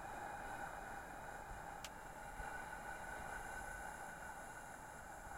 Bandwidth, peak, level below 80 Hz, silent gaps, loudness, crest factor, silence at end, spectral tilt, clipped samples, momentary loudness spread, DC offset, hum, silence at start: 16 kHz; -32 dBFS; -60 dBFS; none; -50 LUFS; 20 dB; 0 s; -3.5 dB/octave; under 0.1%; 4 LU; under 0.1%; none; 0 s